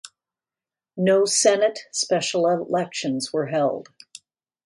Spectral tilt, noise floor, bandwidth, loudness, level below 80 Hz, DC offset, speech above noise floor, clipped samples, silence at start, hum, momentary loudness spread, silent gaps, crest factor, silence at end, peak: -3.5 dB/octave; under -90 dBFS; 11.5 kHz; -22 LUFS; -74 dBFS; under 0.1%; over 69 dB; under 0.1%; 0.05 s; none; 9 LU; none; 18 dB; 0.85 s; -6 dBFS